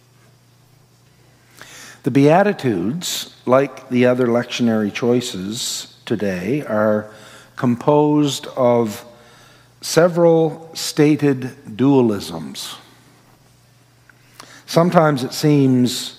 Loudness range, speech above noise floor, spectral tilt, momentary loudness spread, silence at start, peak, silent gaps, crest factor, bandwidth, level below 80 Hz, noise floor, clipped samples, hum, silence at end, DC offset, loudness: 4 LU; 35 dB; -5.5 dB/octave; 14 LU; 1.6 s; 0 dBFS; none; 18 dB; 16 kHz; -64 dBFS; -52 dBFS; under 0.1%; none; 0.05 s; under 0.1%; -17 LUFS